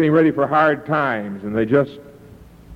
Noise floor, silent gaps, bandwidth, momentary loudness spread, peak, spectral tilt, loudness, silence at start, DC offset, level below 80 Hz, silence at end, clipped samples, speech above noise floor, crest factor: -43 dBFS; none; 5.6 kHz; 9 LU; -4 dBFS; -8.5 dB/octave; -18 LUFS; 0 s; under 0.1%; -52 dBFS; 0 s; under 0.1%; 26 dB; 14 dB